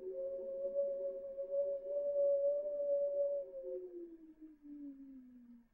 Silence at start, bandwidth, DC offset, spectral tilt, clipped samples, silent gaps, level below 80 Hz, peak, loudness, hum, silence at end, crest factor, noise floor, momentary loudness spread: 0 s; 1.8 kHz; under 0.1%; -9 dB/octave; under 0.1%; none; -76 dBFS; -28 dBFS; -39 LUFS; none; 0.1 s; 12 dB; -60 dBFS; 21 LU